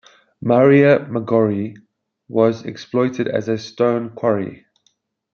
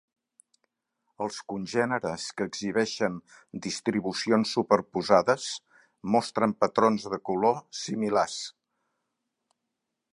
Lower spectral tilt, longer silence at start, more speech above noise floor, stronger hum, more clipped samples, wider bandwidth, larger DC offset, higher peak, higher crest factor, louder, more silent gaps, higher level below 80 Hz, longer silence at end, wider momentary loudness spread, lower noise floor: first, -8 dB/octave vs -4.5 dB/octave; second, 0.4 s vs 1.2 s; second, 48 dB vs 56 dB; neither; neither; second, 6.8 kHz vs 11.5 kHz; neither; first, -2 dBFS vs -6 dBFS; second, 16 dB vs 24 dB; first, -18 LUFS vs -27 LUFS; neither; about the same, -64 dBFS vs -68 dBFS; second, 0.8 s vs 1.65 s; about the same, 13 LU vs 12 LU; second, -65 dBFS vs -84 dBFS